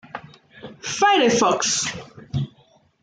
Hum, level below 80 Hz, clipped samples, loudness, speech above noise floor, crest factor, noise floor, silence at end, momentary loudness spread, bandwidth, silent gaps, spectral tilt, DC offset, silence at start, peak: none; -58 dBFS; under 0.1%; -20 LUFS; 38 dB; 16 dB; -57 dBFS; 0.55 s; 20 LU; 10.5 kHz; none; -3 dB/octave; under 0.1%; 0.15 s; -6 dBFS